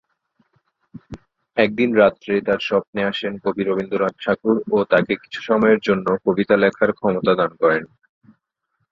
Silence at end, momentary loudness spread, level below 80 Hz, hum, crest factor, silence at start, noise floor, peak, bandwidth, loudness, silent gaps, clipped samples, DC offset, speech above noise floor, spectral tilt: 1.05 s; 8 LU; -58 dBFS; none; 18 dB; 0.95 s; -73 dBFS; -2 dBFS; 7.2 kHz; -19 LUFS; 2.87-2.93 s; under 0.1%; under 0.1%; 55 dB; -7 dB/octave